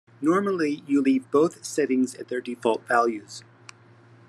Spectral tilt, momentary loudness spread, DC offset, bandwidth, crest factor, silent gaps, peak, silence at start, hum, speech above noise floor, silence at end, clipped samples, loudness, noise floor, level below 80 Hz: -5 dB/octave; 10 LU; under 0.1%; 12.5 kHz; 18 dB; none; -8 dBFS; 0.2 s; none; 29 dB; 0.9 s; under 0.1%; -24 LUFS; -53 dBFS; -82 dBFS